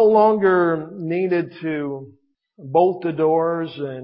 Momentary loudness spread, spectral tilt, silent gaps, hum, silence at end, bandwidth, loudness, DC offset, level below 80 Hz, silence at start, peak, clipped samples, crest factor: 11 LU; -12 dB/octave; none; none; 0 s; 5.4 kHz; -20 LUFS; under 0.1%; -70 dBFS; 0 s; -4 dBFS; under 0.1%; 16 dB